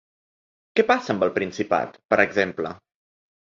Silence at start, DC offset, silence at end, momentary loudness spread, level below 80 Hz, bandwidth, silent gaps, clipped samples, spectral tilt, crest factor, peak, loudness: 0.75 s; under 0.1%; 0.8 s; 6 LU; -62 dBFS; 7.6 kHz; 2.05-2.09 s; under 0.1%; -5.5 dB/octave; 22 dB; -4 dBFS; -23 LUFS